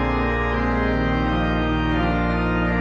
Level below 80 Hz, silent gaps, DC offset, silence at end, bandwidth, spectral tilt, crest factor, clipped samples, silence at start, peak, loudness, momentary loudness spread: -28 dBFS; none; under 0.1%; 0 s; 6.6 kHz; -8 dB/octave; 12 dB; under 0.1%; 0 s; -10 dBFS; -21 LUFS; 1 LU